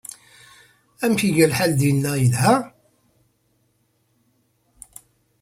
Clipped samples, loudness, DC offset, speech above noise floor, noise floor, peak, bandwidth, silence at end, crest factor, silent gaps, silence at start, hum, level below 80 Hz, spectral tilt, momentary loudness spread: under 0.1%; -19 LUFS; under 0.1%; 48 dB; -66 dBFS; -4 dBFS; 16 kHz; 2.75 s; 20 dB; none; 1 s; none; -56 dBFS; -5.5 dB/octave; 24 LU